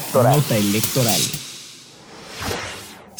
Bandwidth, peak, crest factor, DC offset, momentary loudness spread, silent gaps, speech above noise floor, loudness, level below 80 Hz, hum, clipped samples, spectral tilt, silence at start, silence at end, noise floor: over 20 kHz; -6 dBFS; 16 dB; under 0.1%; 21 LU; none; 25 dB; -19 LUFS; -50 dBFS; none; under 0.1%; -4 dB/octave; 0 s; 0.15 s; -42 dBFS